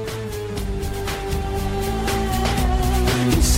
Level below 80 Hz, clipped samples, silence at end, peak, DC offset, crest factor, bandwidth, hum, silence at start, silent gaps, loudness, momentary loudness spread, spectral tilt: -24 dBFS; under 0.1%; 0 s; -8 dBFS; under 0.1%; 14 dB; 16 kHz; none; 0 s; none; -23 LUFS; 9 LU; -5 dB/octave